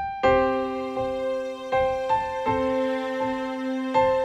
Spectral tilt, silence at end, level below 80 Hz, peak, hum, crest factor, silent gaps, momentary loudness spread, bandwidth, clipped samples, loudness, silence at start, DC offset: -6 dB/octave; 0 s; -48 dBFS; -8 dBFS; none; 16 dB; none; 7 LU; 9.2 kHz; under 0.1%; -25 LUFS; 0 s; under 0.1%